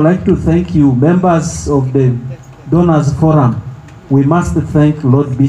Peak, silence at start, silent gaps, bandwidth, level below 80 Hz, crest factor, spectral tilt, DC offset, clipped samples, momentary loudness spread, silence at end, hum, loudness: 0 dBFS; 0 s; none; 11.5 kHz; -32 dBFS; 10 dB; -8 dB/octave; under 0.1%; under 0.1%; 6 LU; 0 s; none; -12 LUFS